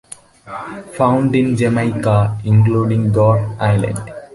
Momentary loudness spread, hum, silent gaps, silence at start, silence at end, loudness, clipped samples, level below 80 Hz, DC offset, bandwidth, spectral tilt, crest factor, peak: 16 LU; none; none; 0.1 s; 0.1 s; -15 LUFS; under 0.1%; -42 dBFS; under 0.1%; 11.5 kHz; -8 dB/octave; 14 dB; -2 dBFS